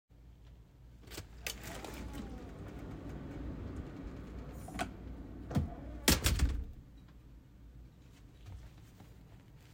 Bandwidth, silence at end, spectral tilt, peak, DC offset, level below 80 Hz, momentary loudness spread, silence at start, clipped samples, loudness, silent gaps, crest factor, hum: 16.5 kHz; 0 s; -4 dB/octave; -12 dBFS; under 0.1%; -46 dBFS; 25 LU; 0.1 s; under 0.1%; -39 LUFS; none; 30 dB; none